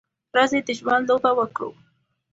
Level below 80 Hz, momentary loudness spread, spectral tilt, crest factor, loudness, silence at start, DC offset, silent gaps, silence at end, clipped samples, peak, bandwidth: -64 dBFS; 10 LU; -3.5 dB/octave; 20 dB; -21 LUFS; 0.35 s; under 0.1%; none; 0.6 s; under 0.1%; -4 dBFS; 8 kHz